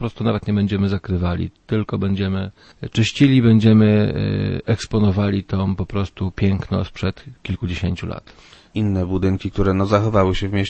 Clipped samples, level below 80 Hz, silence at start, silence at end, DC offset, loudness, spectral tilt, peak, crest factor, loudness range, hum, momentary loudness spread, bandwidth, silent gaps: under 0.1%; -38 dBFS; 0 s; 0 s; under 0.1%; -19 LUFS; -7.5 dB/octave; -2 dBFS; 18 dB; 7 LU; none; 13 LU; 8.6 kHz; none